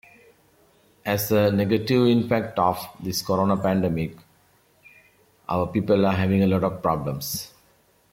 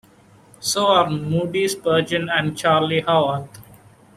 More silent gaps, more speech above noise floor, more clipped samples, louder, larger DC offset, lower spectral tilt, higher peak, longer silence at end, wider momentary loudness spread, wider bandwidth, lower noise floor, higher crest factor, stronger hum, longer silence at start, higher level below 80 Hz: neither; first, 39 dB vs 31 dB; neither; second, -23 LUFS vs -19 LUFS; neither; first, -6 dB/octave vs -4.5 dB/octave; second, -8 dBFS vs -4 dBFS; about the same, 0.65 s vs 0.55 s; first, 10 LU vs 7 LU; about the same, 16.5 kHz vs 15 kHz; first, -61 dBFS vs -51 dBFS; about the same, 16 dB vs 18 dB; neither; first, 1.05 s vs 0.6 s; about the same, -56 dBFS vs -56 dBFS